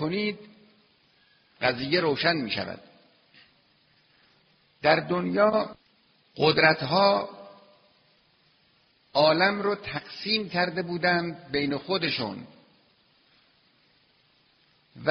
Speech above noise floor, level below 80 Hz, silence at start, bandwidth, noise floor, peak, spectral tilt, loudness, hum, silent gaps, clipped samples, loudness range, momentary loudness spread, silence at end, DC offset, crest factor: 40 dB; -64 dBFS; 0 s; 6.2 kHz; -65 dBFS; -6 dBFS; -2.5 dB/octave; -25 LUFS; none; none; under 0.1%; 6 LU; 14 LU; 0 s; under 0.1%; 24 dB